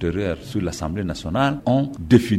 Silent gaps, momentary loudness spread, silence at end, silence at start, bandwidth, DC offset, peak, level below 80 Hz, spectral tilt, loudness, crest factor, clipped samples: none; 9 LU; 0 s; 0 s; 15 kHz; under 0.1%; -2 dBFS; -40 dBFS; -7 dB/octave; -22 LUFS; 18 dB; under 0.1%